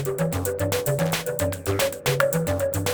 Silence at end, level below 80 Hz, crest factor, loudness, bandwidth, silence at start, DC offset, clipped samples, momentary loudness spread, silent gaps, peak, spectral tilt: 0 s; -50 dBFS; 18 dB; -24 LUFS; over 20 kHz; 0 s; under 0.1%; under 0.1%; 3 LU; none; -6 dBFS; -4.5 dB/octave